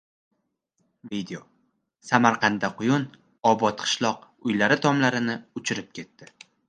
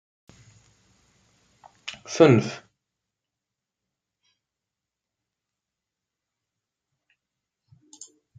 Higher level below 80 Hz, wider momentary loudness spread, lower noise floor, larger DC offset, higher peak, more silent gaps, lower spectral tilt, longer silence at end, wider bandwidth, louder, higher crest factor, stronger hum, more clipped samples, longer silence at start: about the same, -68 dBFS vs -72 dBFS; second, 17 LU vs 29 LU; second, -75 dBFS vs -87 dBFS; neither; about the same, -2 dBFS vs -2 dBFS; neither; second, -4.5 dB/octave vs -6 dB/octave; second, 0.45 s vs 5.8 s; about the same, 10 kHz vs 9.2 kHz; second, -24 LUFS vs -20 LUFS; about the same, 24 dB vs 28 dB; neither; neither; second, 1.05 s vs 1.85 s